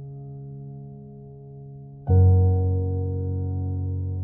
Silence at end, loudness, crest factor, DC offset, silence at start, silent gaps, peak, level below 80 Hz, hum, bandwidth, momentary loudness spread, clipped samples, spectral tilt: 0 s; -23 LUFS; 16 dB; under 0.1%; 0 s; none; -8 dBFS; -42 dBFS; none; 1.6 kHz; 24 LU; under 0.1%; -15 dB/octave